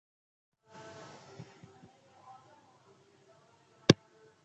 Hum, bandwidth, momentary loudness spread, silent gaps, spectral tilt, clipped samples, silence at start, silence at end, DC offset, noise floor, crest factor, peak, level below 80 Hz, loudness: none; 8.4 kHz; 29 LU; none; -5 dB/octave; under 0.1%; 3.9 s; 0.5 s; under 0.1%; -64 dBFS; 36 dB; -2 dBFS; -66 dBFS; -28 LUFS